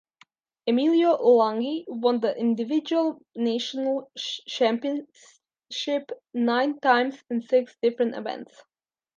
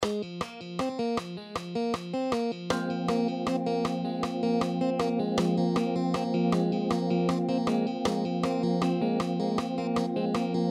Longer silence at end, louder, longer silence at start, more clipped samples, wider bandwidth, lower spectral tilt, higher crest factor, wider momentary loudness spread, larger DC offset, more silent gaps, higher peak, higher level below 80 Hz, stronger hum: first, 0.7 s vs 0 s; first, -25 LUFS vs -29 LUFS; first, 0.65 s vs 0 s; neither; second, 7.4 kHz vs 12 kHz; second, -4.5 dB/octave vs -6.5 dB/octave; about the same, 18 dB vs 16 dB; first, 12 LU vs 5 LU; neither; neither; first, -8 dBFS vs -12 dBFS; second, -82 dBFS vs -60 dBFS; neither